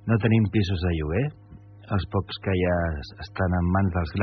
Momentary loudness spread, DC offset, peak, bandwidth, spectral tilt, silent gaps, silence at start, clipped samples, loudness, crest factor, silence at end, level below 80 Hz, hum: 9 LU; under 0.1%; -8 dBFS; 6.2 kHz; -6.5 dB/octave; none; 0.05 s; under 0.1%; -25 LUFS; 16 dB; 0 s; -44 dBFS; none